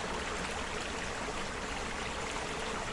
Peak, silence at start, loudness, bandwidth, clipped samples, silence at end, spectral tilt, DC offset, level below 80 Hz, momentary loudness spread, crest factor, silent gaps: -24 dBFS; 0 s; -37 LUFS; 11.5 kHz; under 0.1%; 0 s; -3 dB/octave; under 0.1%; -48 dBFS; 1 LU; 14 dB; none